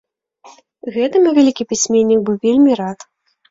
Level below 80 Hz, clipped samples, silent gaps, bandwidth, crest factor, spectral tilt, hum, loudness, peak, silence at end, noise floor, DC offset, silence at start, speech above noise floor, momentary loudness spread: -58 dBFS; under 0.1%; none; 7.8 kHz; 14 dB; -4.5 dB/octave; none; -14 LUFS; -2 dBFS; 0.55 s; -46 dBFS; under 0.1%; 0.85 s; 32 dB; 14 LU